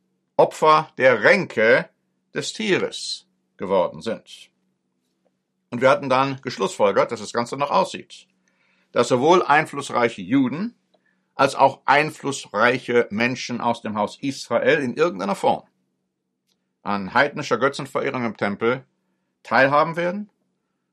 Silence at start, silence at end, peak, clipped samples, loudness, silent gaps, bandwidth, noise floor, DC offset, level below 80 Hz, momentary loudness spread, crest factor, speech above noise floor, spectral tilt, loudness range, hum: 0.4 s; 0.7 s; -2 dBFS; under 0.1%; -21 LUFS; none; 13 kHz; -76 dBFS; under 0.1%; -68 dBFS; 13 LU; 20 dB; 56 dB; -4.5 dB/octave; 5 LU; none